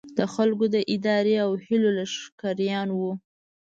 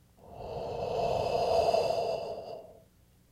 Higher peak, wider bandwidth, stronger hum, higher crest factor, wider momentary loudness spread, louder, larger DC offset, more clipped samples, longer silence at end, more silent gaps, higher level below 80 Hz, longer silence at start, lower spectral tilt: first, -8 dBFS vs -14 dBFS; second, 7.8 kHz vs 15 kHz; neither; about the same, 16 dB vs 18 dB; second, 9 LU vs 19 LU; first, -25 LUFS vs -31 LUFS; neither; neither; about the same, 0.5 s vs 0.6 s; first, 2.32-2.38 s vs none; second, -70 dBFS vs -54 dBFS; second, 0.05 s vs 0.25 s; about the same, -6 dB/octave vs -5 dB/octave